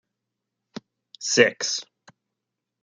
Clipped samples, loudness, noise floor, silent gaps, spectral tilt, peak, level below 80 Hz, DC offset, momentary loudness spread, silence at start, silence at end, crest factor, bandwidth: under 0.1%; -22 LUFS; -84 dBFS; none; -2 dB/octave; -2 dBFS; -74 dBFS; under 0.1%; 24 LU; 1.2 s; 1 s; 26 dB; 9.6 kHz